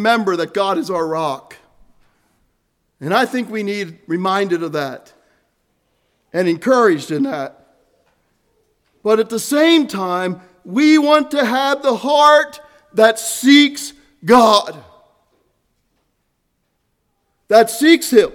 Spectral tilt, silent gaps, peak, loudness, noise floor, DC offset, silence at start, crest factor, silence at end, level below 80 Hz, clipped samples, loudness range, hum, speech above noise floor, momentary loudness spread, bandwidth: -4 dB/octave; none; 0 dBFS; -15 LUFS; -68 dBFS; under 0.1%; 0 s; 16 dB; 0 s; -60 dBFS; under 0.1%; 9 LU; none; 54 dB; 15 LU; 18.5 kHz